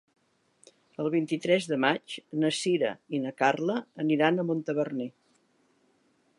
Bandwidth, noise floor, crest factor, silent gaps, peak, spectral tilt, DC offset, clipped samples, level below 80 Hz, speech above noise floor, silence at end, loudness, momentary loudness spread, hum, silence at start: 11.5 kHz; -68 dBFS; 22 dB; none; -8 dBFS; -5 dB/octave; under 0.1%; under 0.1%; -82 dBFS; 41 dB; 1.3 s; -28 LUFS; 9 LU; none; 1 s